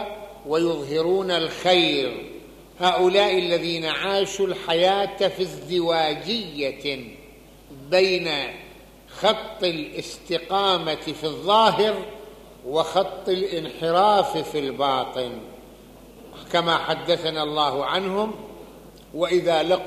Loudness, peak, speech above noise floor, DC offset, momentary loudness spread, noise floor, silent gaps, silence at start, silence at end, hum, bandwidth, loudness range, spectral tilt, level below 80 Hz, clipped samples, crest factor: -22 LUFS; -4 dBFS; 25 dB; under 0.1%; 16 LU; -47 dBFS; none; 0 s; 0 s; none; 15 kHz; 4 LU; -4.5 dB/octave; -54 dBFS; under 0.1%; 20 dB